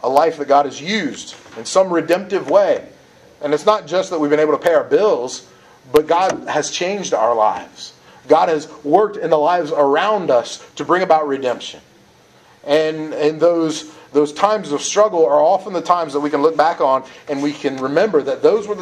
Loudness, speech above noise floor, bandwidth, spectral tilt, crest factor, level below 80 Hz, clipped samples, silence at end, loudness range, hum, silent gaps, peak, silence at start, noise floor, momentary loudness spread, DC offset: -17 LUFS; 33 dB; 14.5 kHz; -4 dB/octave; 16 dB; -62 dBFS; under 0.1%; 0 s; 3 LU; none; none; 0 dBFS; 0.05 s; -49 dBFS; 11 LU; under 0.1%